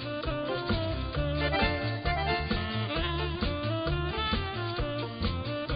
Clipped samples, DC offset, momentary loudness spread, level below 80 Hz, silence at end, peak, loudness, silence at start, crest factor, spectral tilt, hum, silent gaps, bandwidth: under 0.1%; under 0.1%; 5 LU; -38 dBFS; 0 s; -14 dBFS; -31 LUFS; 0 s; 16 dB; -10 dB/octave; none; none; 5.2 kHz